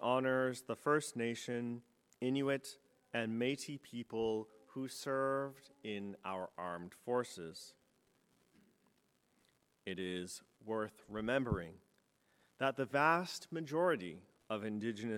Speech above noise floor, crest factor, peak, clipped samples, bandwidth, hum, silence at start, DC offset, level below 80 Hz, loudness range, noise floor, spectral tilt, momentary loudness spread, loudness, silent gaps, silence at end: 37 dB; 24 dB; -16 dBFS; under 0.1%; 17 kHz; none; 0 s; under 0.1%; -68 dBFS; 9 LU; -77 dBFS; -5 dB/octave; 15 LU; -39 LUFS; none; 0 s